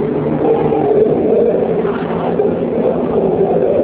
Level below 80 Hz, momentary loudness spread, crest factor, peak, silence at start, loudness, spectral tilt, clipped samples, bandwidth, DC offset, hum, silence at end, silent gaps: -42 dBFS; 4 LU; 12 dB; -2 dBFS; 0 s; -14 LUFS; -12.5 dB/octave; under 0.1%; 4 kHz; under 0.1%; none; 0 s; none